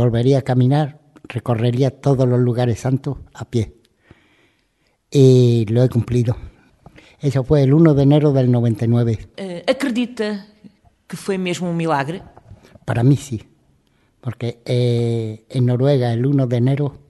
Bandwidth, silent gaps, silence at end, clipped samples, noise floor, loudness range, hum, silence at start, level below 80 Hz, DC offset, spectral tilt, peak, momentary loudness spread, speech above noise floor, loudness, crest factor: 12 kHz; none; 0.15 s; under 0.1%; -64 dBFS; 6 LU; none; 0 s; -46 dBFS; under 0.1%; -8 dB/octave; 0 dBFS; 15 LU; 48 dB; -18 LUFS; 18 dB